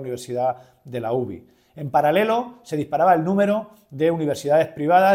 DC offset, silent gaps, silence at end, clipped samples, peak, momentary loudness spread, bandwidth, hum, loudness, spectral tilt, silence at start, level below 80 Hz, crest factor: under 0.1%; none; 0 s; under 0.1%; -4 dBFS; 15 LU; 16 kHz; none; -21 LUFS; -6.5 dB/octave; 0 s; -64 dBFS; 16 dB